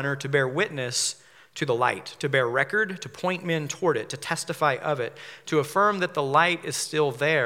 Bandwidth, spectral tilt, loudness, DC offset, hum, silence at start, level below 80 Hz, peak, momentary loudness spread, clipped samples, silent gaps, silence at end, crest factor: 17 kHz; -3.5 dB/octave; -25 LUFS; under 0.1%; none; 0 s; -78 dBFS; -6 dBFS; 8 LU; under 0.1%; none; 0 s; 20 dB